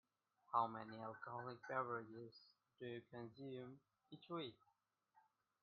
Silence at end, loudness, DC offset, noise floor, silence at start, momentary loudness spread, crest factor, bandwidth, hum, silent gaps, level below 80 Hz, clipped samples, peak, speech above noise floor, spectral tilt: 0.4 s; -49 LUFS; under 0.1%; -82 dBFS; 0.5 s; 18 LU; 26 dB; 5.2 kHz; none; none; under -90 dBFS; under 0.1%; -26 dBFS; 33 dB; -4 dB/octave